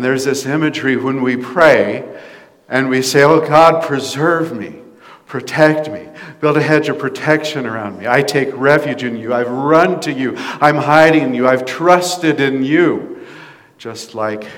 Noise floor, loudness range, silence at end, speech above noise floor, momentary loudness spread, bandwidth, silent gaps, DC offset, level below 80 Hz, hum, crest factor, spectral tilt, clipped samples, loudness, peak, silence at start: -40 dBFS; 4 LU; 0 s; 26 dB; 16 LU; 17.5 kHz; none; under 0.1%; -58 dBFS; none; 14 dB; -5 dB/octave; 0.5%; -14 LUFS; 0 dBFS; 0 s